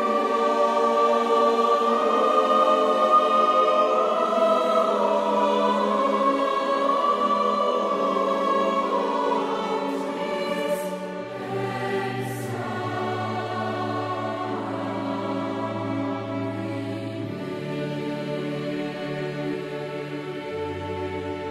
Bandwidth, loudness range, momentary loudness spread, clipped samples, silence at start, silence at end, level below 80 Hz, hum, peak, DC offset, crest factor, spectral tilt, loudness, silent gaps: 15.5 kHz; 10 LU; 11 LU; under 0.1%; 0 s; 0 s; -64 dBFS; none; -8 dBFS; under 0.1%; 16 dB; -6 dB/octave; -24 LUFS; none